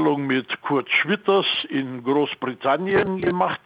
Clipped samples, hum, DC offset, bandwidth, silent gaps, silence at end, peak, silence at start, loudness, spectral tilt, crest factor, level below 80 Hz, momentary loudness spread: under 0.1%; none; under 0.1%; 5.2 kHz; none; 0.1 s; -6 dBFS; 0 s; -22 LUFS; -7.5 dB/octave; 16 dB; -58 dBFS; 6 LU